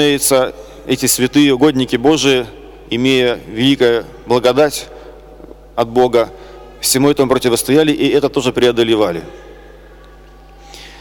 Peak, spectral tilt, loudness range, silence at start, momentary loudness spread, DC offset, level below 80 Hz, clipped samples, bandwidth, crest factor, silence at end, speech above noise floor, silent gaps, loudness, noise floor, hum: -2 dBFS; -4 dB/octave; 2 LU; 0 s; 11 LU; under 0.1%; -42 dBFS; under 0.1%; 19 kHz; 12 dB; 0.05 s; 26 dB; none; -14 LUFS; -39 dBFS; none